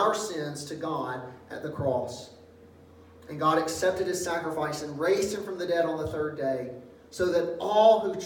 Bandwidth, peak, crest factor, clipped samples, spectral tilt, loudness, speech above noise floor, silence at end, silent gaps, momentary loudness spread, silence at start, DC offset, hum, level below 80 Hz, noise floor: 18 kHz; -8 dBFS; 20 dB; under 0.1%; -4.5 dB/octave; -28 LUFS; 25 dB; 0 s; none; 15 LU; 0 s; under 0.1%; none; -60 dBFS; -52 dBFS